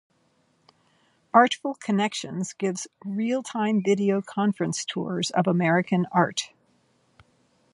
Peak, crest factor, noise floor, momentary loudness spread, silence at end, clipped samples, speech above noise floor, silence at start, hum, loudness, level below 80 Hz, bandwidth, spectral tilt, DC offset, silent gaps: -4 dBFS; 22 dB; -67 dBFS; 9 LU; 1.25 s; under 0.1%; 43 dB; 1.35 s; none; -25 LUFS; -72 dBFS; 11.5 kHz; -5 dB/octave; under 0.1%; none